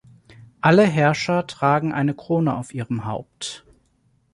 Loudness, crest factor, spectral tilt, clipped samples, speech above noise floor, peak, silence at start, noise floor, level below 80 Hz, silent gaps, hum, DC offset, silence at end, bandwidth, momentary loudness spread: -20 LUFS; 20 dB; -6.5 dB/octave; under 0.1%; 43 dB; -2 dBFS; 0.65 s; -63 dBFS; -58 dBFS; none; none; under 0.1%; 0.75 s; 11.5 kHz; 16 LU